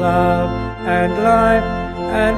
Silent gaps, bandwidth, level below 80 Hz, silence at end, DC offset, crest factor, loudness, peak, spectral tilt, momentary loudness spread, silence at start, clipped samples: none; 13.5 kHz; -30 dBFS; 0 s; under 0.1%; 14 dB; -16 LUFS; -2 dBFS; -7 dB/octave; 9 LU; 0 s; under 0.1%